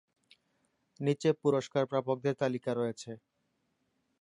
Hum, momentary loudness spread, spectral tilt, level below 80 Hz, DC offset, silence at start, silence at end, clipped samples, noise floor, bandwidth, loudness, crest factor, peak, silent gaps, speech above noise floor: none; 12 LU; -6.5 dB/octave; -80 dBFS; under 0.1%; 1 s; 1.05 s; under 0.1%; -79 dBFS; 11 kHz; -32 LUFS; 18 dB; -16 dBFS; none; 47 dB